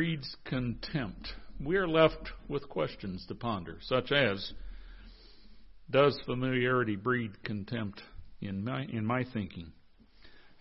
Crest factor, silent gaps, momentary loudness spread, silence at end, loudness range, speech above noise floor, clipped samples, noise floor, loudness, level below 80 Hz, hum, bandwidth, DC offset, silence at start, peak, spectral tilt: 22 dB; none; 18 LU; 0 s; 4 LU; 25 dB; under 0.1%; -57 dBFS; -32 LUFS; -52 dBFS; none; 5.8 kHz; under 0.1%; 0 s; -10 dBFS; -9.5 dB/octave